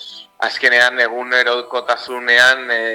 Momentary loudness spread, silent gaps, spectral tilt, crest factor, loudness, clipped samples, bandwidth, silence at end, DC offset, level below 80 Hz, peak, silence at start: 11 LU; none; -0.5 dB/octave; 16 dB; -14 LUFS; under 0.1%; over 20 kHz; 0 s; under 0.1%; -66 dBFS; 0 dBFS; 0 s